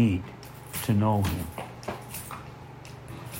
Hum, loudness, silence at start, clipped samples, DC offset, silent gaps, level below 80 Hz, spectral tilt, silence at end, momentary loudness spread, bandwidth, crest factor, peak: none; -30 LUFS; 0 s; under 0.1%; under 0.1%; none; -52 dBFS; -6.5 dB/octave; 0 s; 19 LU; 16.5 kHz; 18 dB; -12 dBFS